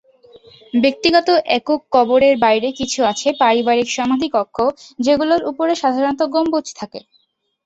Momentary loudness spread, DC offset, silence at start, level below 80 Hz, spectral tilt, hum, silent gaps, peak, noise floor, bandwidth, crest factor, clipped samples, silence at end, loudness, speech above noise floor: 8 LU; under 0.1%; 0.75 s; -54 dBFS; -3.5 dB/octave; none; none; -2 dBFS; -46 dBFS; 8.2 kHz; 16 dB; under 0.1%; 0.65 s; -16 LUFS; 30 dB